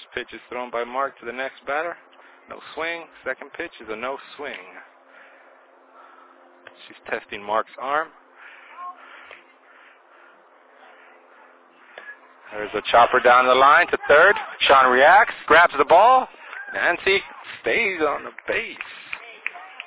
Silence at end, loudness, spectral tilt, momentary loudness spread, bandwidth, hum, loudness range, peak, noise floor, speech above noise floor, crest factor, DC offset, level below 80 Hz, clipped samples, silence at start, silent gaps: 0.2 s; -19 LUFS; -6.5 dB/octave; 22 LU; 4 kHz; none; 20 LU; -4 dBFS; -53 dBFS; 33 dB; 18 dB; under 0.1%; -58 dBFS; under 0.1%; 0.15 s; none